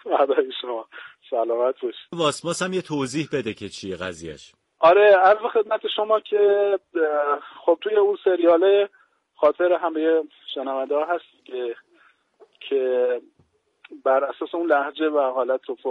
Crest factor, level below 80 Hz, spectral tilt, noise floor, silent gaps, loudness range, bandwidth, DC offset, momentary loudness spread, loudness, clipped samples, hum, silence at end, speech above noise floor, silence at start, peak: 18 dB; -68 dBFS; -4.5 dB/octave; -64 dBFS; none; 8 LU; 11.5 kHz; under 0.1%; 14 LU; -22 LUFS; under 0.1%; none; 0 s; 43 dB; 0.05 s; -4 dBFS